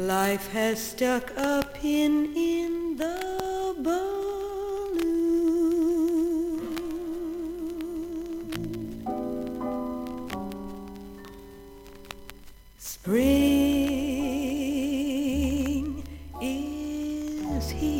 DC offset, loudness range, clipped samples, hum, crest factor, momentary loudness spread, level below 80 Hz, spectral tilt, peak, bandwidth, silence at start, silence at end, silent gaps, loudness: under 0.1%; 9 LU; under 0.1%; none; 18 dB; 17 LU; -46 dBFS; -5 dB/octave; -8 dBFS; 17 kHz; 0 s; 0 s; none; -28 LUFS